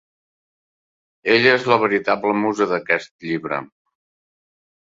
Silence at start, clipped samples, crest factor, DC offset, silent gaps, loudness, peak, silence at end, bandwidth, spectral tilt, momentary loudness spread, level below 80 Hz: 1.25 s; under 0.1%; 20 dB; under 0.1%; 3.11-3.19 s; -19 LUFS; -2 dBFS; 1.25 s; 7.8 kHz; -5 dB/octave; 13 LU; -64 dBFS